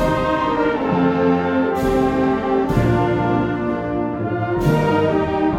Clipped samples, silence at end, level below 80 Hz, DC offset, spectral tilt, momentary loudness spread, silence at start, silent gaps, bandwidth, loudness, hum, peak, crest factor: under 0.1%; 0 s; -36 dBFS; under 0.1%; -8 dB/octave; 5 LU; 0 s; none; 16 kHz; -18 LUFS; none; -4 dBFS; 14 dB